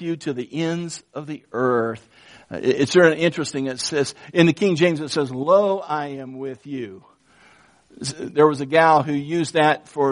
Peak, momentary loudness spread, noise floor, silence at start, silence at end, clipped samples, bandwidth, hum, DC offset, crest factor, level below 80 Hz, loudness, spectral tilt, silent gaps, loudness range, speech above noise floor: -2 dBFS; 16 LU; -54 dBFS; 0 s; 0 s; under 0.1%; 10.5 kHz; none; under 0.1%; 20 dB; -64 dBFS; -20 LUFS; -5 dB/octave; none; 5 LU; 33 dB